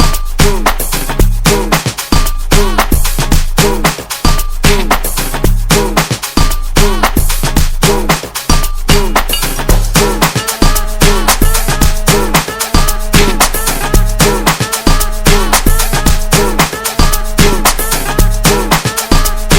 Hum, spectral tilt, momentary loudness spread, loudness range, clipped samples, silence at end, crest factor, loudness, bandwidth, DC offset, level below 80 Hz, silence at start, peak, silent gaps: none; -3.5 dB/octave; 4 LU; 1 LU; 0.9%; 0 s; 10 dB; -11 LUFS; 18.5 kHz; under 0.1%; -12 dBFS; 0 s; 0 dBFS; none